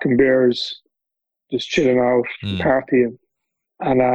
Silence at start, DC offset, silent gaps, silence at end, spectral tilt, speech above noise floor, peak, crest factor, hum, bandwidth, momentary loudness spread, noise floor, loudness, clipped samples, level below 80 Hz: 0 s; under 0.1%; none; 0 s; -6 dB/octave; 66 dB; -4 dBFS; 16 dB; none; 8 kHz; 12 LU; -83 dBFS; -19 LUFS; under 0.1%; -50 dBFS